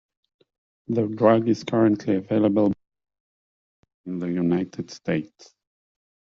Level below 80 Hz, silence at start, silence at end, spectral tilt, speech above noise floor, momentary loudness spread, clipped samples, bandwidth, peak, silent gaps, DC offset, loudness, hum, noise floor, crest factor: -64 dBFS; 0.9 s; 1.1 s; -7 dB/octave; over 68 dB; 14 LU; under 0.1%; 7.2 kHz; -4 dBFS; 3.20-3.83 s, 3.94-4.04 s; under 0.1%; -23 LUFS; none; under -90 dBFS; 22 dB